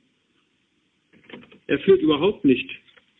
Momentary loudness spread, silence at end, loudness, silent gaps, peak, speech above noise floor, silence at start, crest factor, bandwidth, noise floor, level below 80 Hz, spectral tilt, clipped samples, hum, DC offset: 20 LU; 0.45 s; -20 LUFS; none; -6 dBFS; 49 dB; 1.35 s; 18 dB; 4 kHz; -68 dBFS; -58 dBFS; -9 dB/octave; under 0.1%; none; under 0.1%